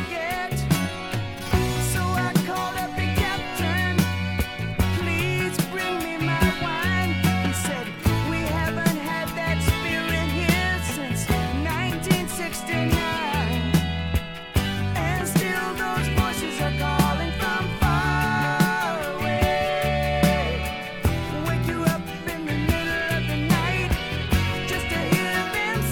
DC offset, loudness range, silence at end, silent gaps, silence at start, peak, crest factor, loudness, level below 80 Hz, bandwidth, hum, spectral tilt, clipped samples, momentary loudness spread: under 0.1%; 2 LU; 0 s; none; 0 s; -6 dBFS; 18 dB; -24 LUFS; -34 dBFS; 18 kHz; none; -5 dB/octave; under 0.1%; 5 LU